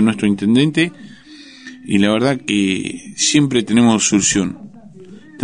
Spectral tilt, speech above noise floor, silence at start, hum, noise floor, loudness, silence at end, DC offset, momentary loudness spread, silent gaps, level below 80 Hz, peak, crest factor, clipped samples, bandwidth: -4 dB/octave; 24 dB; 0 s; none; -40 dBFS; -15 LUFS; 0 s; 0.2%; 13 LU; none; -50 dBFS; -2 dBFS; 16 dB; under 0.1%; 10 kHz